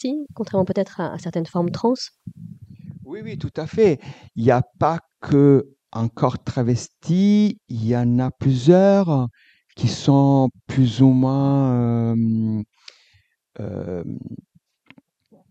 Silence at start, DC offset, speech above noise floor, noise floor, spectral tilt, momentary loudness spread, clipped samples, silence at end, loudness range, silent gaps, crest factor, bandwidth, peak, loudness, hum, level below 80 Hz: 0 s; under 0.1%; 42 dB; -61 dBFS; -8 dB/octave; 18 LU; under 0.1%; 1.15 s; 8 LU; none; 18 dB; 8.4 kHz; -2 dBFS; -20 LUFS; none; -56 dBFS